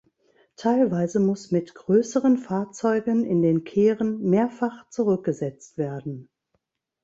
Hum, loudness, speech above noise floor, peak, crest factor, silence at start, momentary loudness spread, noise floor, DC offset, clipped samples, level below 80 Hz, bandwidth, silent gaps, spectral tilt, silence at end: none; -24 LUFS; 52 dB; -8 dBFS; 14 dB; 0.6 s; 9 LU; -75 dBFS; under 0.1%; under 0.1%; -66 dBFS; 8 kHz; none; -7.5 dB/octave; 0.8 s